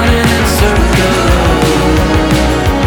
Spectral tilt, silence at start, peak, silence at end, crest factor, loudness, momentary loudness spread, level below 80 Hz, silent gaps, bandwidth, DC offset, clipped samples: -5 dB/octave; 0 s; 0 dBFS; 0 s; 8 dB; -10 LUFS; 1 LU; -16 dBFS; none; 19.5 kHz; under 0.1%; under 0.1%